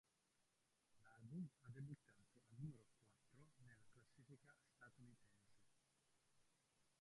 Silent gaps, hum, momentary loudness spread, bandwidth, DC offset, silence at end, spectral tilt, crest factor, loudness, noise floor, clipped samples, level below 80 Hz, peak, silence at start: none; none; 13 LU; 11 kHz; under 0.1%; 0.05 s; -7 dB/octave; 20 dB; -60 LUFS; -86 dBFS; under 0.1%; -88 dBFS; -44 dBFS; 0.4 s